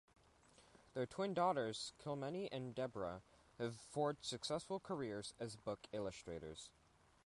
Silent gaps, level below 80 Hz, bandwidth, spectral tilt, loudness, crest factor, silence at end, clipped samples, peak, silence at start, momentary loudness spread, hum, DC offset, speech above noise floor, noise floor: none; -74 dBFS; 11.5 kHz; -5 dB/octave; -45 LUFS; 20 dB; 0.55 s; under 0.1%; -26 dBFS; 0.6 s; 12 LU; none; under 0.1%; 25 dB; -70 dBFS